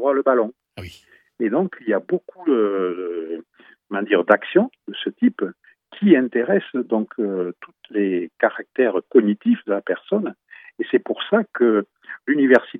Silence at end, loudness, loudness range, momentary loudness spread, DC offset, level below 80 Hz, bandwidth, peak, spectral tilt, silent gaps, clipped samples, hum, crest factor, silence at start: 0 s; -21 LUFS; 3 LU; 13 LU; under 0.1%; -66 dBFS; 5.4 kHz; 0 dBFS; -8 dB/octave; none; under 0.1%; none; 20 dB; 0 s